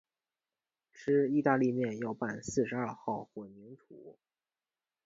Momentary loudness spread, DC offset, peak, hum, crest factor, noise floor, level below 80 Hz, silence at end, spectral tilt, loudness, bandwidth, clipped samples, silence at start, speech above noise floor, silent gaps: 20 LU; under 0.1%; -14 dBFS; none; 20 dB; under -90 dBFS; -70 dBFS; 0.95 s; -6.5 dB/octave; -33 LUFS; 7.8 kHz; under 0.1%; 0.95 s; over 57 dB; none